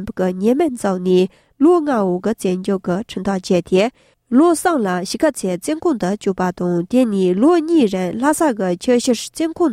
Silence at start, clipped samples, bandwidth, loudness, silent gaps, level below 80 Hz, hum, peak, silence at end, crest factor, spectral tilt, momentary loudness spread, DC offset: 0 s; under 0.1%; 15.5 kHz; -17 LUFS; none; -52 dBFS; none; -2 dBFS; 0 s; 14 dB; -6 dB/octave; 7 LU; under 0.1%